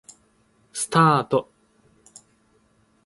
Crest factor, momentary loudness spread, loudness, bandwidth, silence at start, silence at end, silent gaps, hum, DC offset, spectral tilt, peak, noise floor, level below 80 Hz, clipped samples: 22 dB; 13 LU; -20 LUFS; 11.5 kHz; 0.75 s; 1.65 s; none; none; under 0.1%; -5 dB/octave; -4 dBFS; -62 dBFS; -66 dBFS; under 0.1%